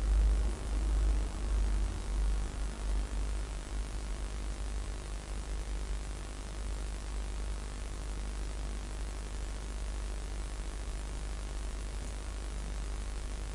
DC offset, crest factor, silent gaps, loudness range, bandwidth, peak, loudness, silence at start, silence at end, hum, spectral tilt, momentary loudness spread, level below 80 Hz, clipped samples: under 0.1%; 16 dB; none; 5 LU; 11.5 kHz; -20 dBFS; -39 LUFS; 0 s; 0 s; none; -5 dB/octave; 7 LU; -34 dBFS; under 0.1%